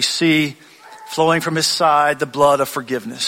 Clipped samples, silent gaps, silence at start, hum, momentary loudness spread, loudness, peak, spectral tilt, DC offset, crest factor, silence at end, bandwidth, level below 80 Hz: under 0.1%; none; 0 s; none; 10 LU; -16 LUFS; -2 dBFS; -3.5 dB/octave; under 0.1%; 16 dB; 0 s; 16.5 kHz; -58 dBFS